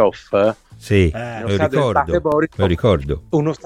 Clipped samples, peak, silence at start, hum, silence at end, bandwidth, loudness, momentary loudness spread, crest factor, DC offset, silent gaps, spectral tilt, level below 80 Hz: under 0.1%; -2 dBFS; 0 s; none; 0.1 s; 12.5 kHz; -18 LUFS; 4 LU; 16 dB; under 0.1%; none; -7.5 dB/octave; -34 dBFS